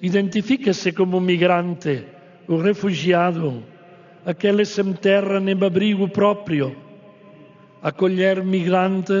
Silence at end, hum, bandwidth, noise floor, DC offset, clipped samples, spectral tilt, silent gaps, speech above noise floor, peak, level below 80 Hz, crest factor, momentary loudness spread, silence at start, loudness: 0 s; none; 7.4 kHz; -47 dBFS; under 0.1%; under 0.1%; -5.5 dB/octave; none; 28 dB; -4 dBFS; -66 dBFS; 16 dB; 9 LU; 0 s; -20 LUFS